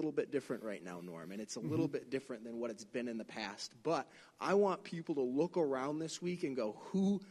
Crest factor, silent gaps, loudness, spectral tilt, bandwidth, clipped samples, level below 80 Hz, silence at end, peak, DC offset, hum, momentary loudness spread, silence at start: 16 dB; none; -39 LUFS; -6 dB/octave; 13.5 kHz; under 0.1%; -80 dBFS; 0 s; -22 dBFS; under 0.1%; none; 10 LU; 0 s